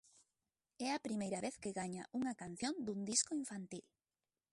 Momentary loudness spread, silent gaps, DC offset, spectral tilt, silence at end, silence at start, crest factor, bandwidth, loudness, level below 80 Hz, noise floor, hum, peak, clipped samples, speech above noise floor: 11 LU; none; under 0.1%; -3 dB/octave; 0.7 s; 0.8 s; 22 dB; 11.5 kHz; -42 LUFS; -78 dBFS; under -90 dBFS; none; -22 dBFS; under 0.1%; over 48 dB